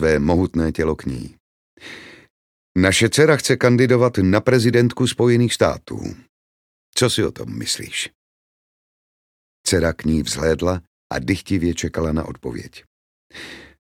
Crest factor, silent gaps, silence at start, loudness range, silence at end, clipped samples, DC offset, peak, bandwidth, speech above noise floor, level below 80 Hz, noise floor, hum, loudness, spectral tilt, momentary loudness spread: 20 dB; 1.40-1.77 s, 2.30-2.75 s, 6.29-6.93 s, 8.15-9.64 s, 10.87-11.10 s, 12.87-13.30 s; 0 s; 9 LU; 0.15 s; under 0.1%; under 0.1%; 0 dBFS; 16.5 kHz; 21 dB; -40 dBFS; -39 dBFS; none; -19 LUFS; -5 dB/octave; 19 LU